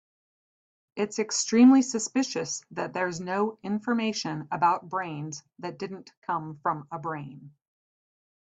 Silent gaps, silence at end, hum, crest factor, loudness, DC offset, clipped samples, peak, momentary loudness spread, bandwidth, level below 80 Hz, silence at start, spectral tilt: 6.17-6.22 s; 0.9 s; none; 18 dB; -27 LUFS; under 0.1%; under 0.1%; -10 dBFS; 18 LU; 8.6 kHz; -72 dBFS; 0.95 s; -4 dB/octave